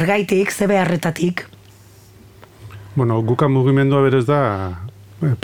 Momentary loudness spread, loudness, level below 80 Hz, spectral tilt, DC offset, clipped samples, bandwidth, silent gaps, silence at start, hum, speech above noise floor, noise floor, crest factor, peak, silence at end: 14 LU; -17 LUFS; -52 dBFS; -7 dB/octave; under 0.1%; under 0.1%; 17.5 kHz; none; 0 s; none; 29 dB; -45 dBFS; 14 dB; -4 dBFS; 0.05 s